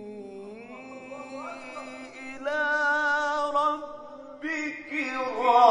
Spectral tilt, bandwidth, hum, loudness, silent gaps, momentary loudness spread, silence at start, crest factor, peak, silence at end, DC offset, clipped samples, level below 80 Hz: -3 dB/octave; 10.5 kHz; none; -27 LUFS; none; 19 LU; 0 s; 22 dB; -6 dBFS; 0 s; under 0.1%; under 0.1%; -68 dBFS